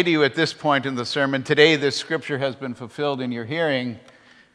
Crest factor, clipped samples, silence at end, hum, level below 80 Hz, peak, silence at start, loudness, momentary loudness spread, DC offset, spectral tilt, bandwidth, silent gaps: 22 dB; under 0.1%; 0.55 s; none; -70 dBFS; 0 dBFS; 0 s; -21 LUFS; 12 LU; under 0.1%; -5 dB/octave; 10.5 kHz; none